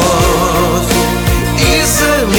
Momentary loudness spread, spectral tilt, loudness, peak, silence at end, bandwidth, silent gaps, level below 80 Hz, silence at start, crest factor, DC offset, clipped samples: 3 LU; -4 dB/octave; -11 LUFS; 0 dBFS; 0 s; 19.5 kHz; none; -20 dBFS; 0 s; 10 dB; under 0.1%; under 0.1%